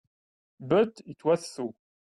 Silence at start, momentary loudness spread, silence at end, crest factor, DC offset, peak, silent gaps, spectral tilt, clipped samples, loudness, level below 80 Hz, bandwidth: 0.6 s; 13 LU; 0.45 s; 18 dB; under 0.1%; -12 dBFS; none; -6 dB/octave; under 0.1%; -28 LUFS; -68 dBFS; 12 kHz